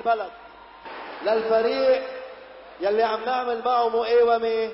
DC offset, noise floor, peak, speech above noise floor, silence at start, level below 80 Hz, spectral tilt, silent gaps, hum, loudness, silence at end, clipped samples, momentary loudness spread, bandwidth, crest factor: under 0.1%; -43 dBFS; -10 dBFS; 21 dB; 0 s; -62 dBFS; -7.5 dB/octave; none; none; -23 LUFS; 0 s; under 0.1%; 20 LU; 5.8 kHz; 14 dB